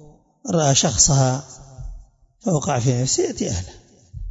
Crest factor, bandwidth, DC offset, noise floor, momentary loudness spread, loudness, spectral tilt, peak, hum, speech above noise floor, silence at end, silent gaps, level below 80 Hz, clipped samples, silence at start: 20 dB; 8 kHz; under 0.1%; -46 dBFS; 24 LU; -19 LUFS; -4 dB/octave; -2 dBFS; none; 26 dB; 0 s; none; -40 dBFS; under 0.1%; 0.45 s